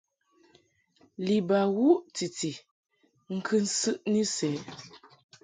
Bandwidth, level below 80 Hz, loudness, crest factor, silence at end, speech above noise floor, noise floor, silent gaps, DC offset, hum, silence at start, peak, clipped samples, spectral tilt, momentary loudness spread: 9.6 kHz; -74 dBFS; -28 LUFS; 20 dB; 0.45 s; 38 dB; -66 dBFS; 2.71-2.84 s; under 0.1%; none; 1.2 s; -10 dBFS; under 0.1%; -4.5 dB/octave; 20 LU